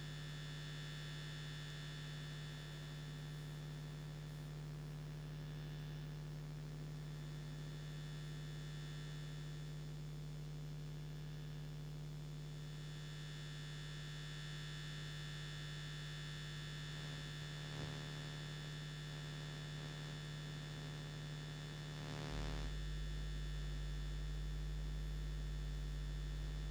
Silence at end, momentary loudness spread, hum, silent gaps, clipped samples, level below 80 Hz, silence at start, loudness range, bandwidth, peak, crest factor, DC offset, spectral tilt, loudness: 0 s; 3 LU; none; none; under 0.1%; -52 dBFS; 0 s; 3 LU; over 20 kHz; -30 dBFS; 18 dB; under 0.1%; -5 dB/octave; -48 LUFS